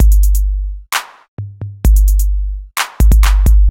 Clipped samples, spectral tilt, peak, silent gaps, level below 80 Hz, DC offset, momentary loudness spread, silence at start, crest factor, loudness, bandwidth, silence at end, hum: under 0.1%; -4.5 dB/octave; -2 dBFS; 1.28-1.37 s; -10 dBFS; under 0.1%; 16 LU; 0 s; 10 dB; -15 LUFS; 16.5 kHz; 0 s; none